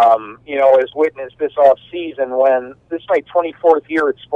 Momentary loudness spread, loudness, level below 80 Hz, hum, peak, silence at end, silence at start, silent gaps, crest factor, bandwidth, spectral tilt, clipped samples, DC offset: 11 LU; -16 LUFS; -60 dBFS; none; 0 dBFS; 0 s; 0 s; none; 16 dB; 5.4 kHz; -6 dB/octave; under 0.1%; under 0.1%